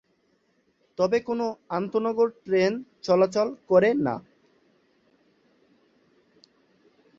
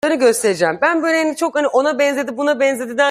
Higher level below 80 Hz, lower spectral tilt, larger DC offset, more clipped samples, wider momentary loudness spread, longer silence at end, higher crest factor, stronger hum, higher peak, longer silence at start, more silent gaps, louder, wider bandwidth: about the same, -68 dBFS vs -64 dBFS; first, -6.5 dB/octave vs -3 dB/octave; neither; neither; first, 9 LU vs 4 LU; first, 3 s vs 0 s; first, 20 dB vs 14 dB; neither; second, -8 dBFS vs -2 dBFS; first, 1 s vs 0.05 s; neither; second, -25 LUFS vs -16 LUFS; second, 7.6 kHz vs 15.5 kHz